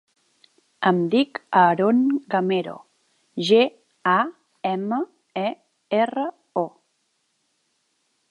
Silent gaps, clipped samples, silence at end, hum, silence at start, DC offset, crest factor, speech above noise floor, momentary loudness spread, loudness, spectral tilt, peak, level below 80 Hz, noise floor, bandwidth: none; under 0.1%; 1.6 s; none; 0.8 s; under 0.1%; 20 dB; 51 dB; 12 LU; -22 LUFS; -6.5 dB/octave; -4 dBFS; -76 dBFS; -71 dBFS; 11 kHz